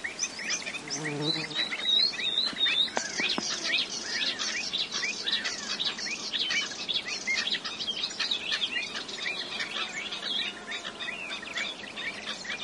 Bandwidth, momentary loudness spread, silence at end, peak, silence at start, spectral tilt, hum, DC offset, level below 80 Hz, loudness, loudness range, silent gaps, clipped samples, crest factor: 11.5 kHz; 9 LU; 0 s; -10 dBFS; 0 s; -0.5 dB/octave; none; under 0.1%; -70 dBFS; -29 LUFS; 6 LU; none; under 0.1%; 22 dB